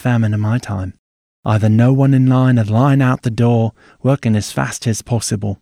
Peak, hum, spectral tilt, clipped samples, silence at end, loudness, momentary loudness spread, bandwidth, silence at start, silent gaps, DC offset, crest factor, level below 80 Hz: -2 dBFS; none; -7 dB/octave; under 0.1%; 0.05 s; -15 LUFS; 9 LU; 14 kHz; 0.05 s; 0.99-1.43 s; under 0.1%; 12 dB; -48 dBFS